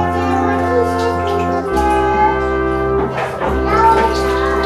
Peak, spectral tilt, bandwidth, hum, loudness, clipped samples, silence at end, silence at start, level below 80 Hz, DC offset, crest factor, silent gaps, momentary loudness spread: 0 dBFS; -6.5 dB/octave; 14.5 kHz; none; -15 LUFS; under 0.1%; 0 s; 0 s; -28 dBFS; under 0.1%; 14 dB; none; 6 LU